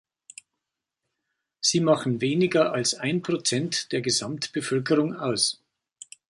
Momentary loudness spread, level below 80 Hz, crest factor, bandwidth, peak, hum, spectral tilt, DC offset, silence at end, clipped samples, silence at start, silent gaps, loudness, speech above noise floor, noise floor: 5 LU; -68 dBFS; 20 dB; 11.5 kHz; -6 dBFS; none; -4 dB/octave; under 0.1%; 0.75 s; under 0.1%; 1.6 s; none; -24 LUFS; 60 dB; -85 dBFS